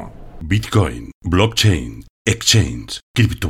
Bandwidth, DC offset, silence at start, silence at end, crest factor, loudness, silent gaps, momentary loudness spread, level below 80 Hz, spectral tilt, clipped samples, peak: 15 kHz; under 0.1%; 0 s; 0 s; 18 dB; -17 LUFS; 1.15-1.21 s, 2.10-2.25 s, 3.03-3.14 s; 15 LU; -32 dBFS; -4.5 dB/octave; under 0.1%; 0 dBFS